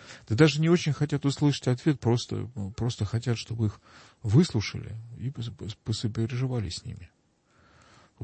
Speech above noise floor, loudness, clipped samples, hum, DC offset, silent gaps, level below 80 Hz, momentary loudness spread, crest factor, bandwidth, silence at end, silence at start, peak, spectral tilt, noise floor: 37 dB; -28 LUFS; under 0.1%; none; under 0.1%; none; -54 dBFS; 15 LU; 20 dB; 8.8 kHz; 0 s; 0 s; -8 dBFS; -6.5 dB/octave; -64 dBFS